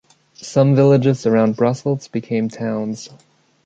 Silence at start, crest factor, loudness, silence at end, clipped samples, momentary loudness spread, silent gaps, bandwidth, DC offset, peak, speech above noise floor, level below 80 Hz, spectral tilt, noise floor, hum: 0.4 s; 16 dB; -17 LUFS; 0.6 s; under 0.1%; 15 LU; none; 8 kHz; under 0.1%; -2 dBFS; 23 dB; -60 dBFS; -7.5 dB/octave; -39 dBFS; none